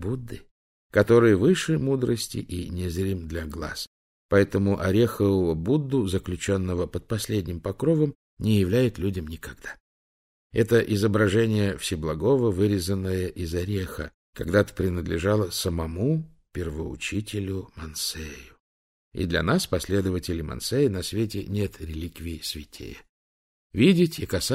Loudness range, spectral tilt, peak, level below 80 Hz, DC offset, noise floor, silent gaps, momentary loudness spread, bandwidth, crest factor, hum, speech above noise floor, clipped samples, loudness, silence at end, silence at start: 5 LU; -6 dB/octave; -6 dBFS; -44 dBFS; under 0.1%; under -90 dBFS; 0.51-0.90 s, 3.87-4.29 s, 8.15-8.37 s, 9.80-10.50 s, 14.14-14.33 s, 18.60-19.11 s, 23.09-23.70 s; 14 LU; 16 kHz; 20 dB; none; over 65 dB; under 0.1%; -25 LUFS; 0 s; 0 s